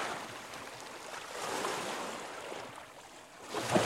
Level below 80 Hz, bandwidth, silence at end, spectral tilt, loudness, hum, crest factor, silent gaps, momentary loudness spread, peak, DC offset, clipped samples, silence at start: -74 dBFS; 16 kHz; 0 s; -3.5 dB/octave; -40 LUFS; none; 26 dB; none; 14 LU; -14 dBFS; under 0.1%; under 0.1%; 0 s